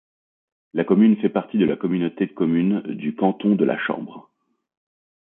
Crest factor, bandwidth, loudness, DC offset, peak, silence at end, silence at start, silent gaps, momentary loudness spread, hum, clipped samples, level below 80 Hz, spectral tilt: 18 dB; 3.8 kHz; -21 LUFS; under 0.1%; -4 dBFS; 1 s; 0.75 s; none; 11 LU; none; under 0.1%; -66 dBFS; -12 dB/octave